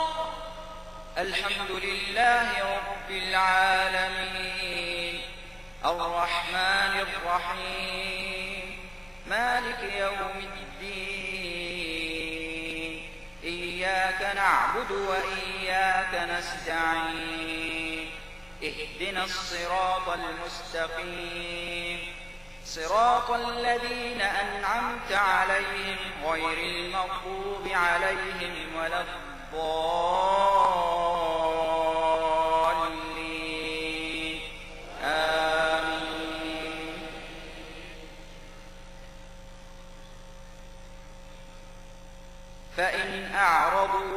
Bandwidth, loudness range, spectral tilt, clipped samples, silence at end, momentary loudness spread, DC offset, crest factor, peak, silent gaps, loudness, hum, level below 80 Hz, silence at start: 15.5 kHz; 7 LU; -3 dB/octave; under 0.1%; 0 s; 17 LU; under 0.1%; 20 dB; -8 dBFS; none; -28 LUFS; none; -46 dBFS; 0 s